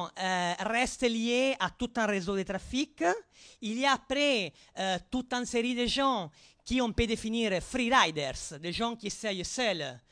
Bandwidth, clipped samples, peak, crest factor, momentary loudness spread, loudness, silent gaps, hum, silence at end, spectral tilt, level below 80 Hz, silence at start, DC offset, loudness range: 10.5 kHz; under 0.1%; -10 dBFS; 20 dB; 8 LU; -30 LUFS; none; none; 0.1 s; -3.5 dB/octave; -52 dBFS; 0 s; under 0.1%; 2 LU